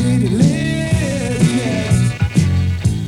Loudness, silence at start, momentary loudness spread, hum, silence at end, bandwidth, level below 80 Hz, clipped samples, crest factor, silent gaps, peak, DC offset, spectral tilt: -16 LUFS; 0 s; 4 LU; none; 0 s; 13 kHz; -30 dBFS; under 0.1%; 14 dB; none; 0 dBFS; under 0.1%; -6.5 dB/octave